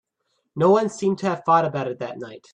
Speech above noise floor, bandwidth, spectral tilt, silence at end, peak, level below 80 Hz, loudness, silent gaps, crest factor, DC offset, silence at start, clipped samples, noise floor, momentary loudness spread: 52 dB; 9.8 kHz; -6.5 dB/octave; 0.15 s; -6 dBFS; -68 dBFS; -21 LUFS; none; 16 dB; under 0.1%; 0.55 s; under 0.1%; -73 dBFS; 15 LU